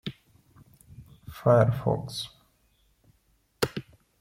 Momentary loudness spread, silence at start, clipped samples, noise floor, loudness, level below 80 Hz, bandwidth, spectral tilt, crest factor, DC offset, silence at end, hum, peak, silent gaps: 20 LU; 0.05 s; under 0.1%; -68 dBFS; -26 LUFS; -56 dBFS; 16.5 kHz; -6.5 dB/octave; 22 dB; under 0.1%; 0.4 s; none; -8 dBFS; none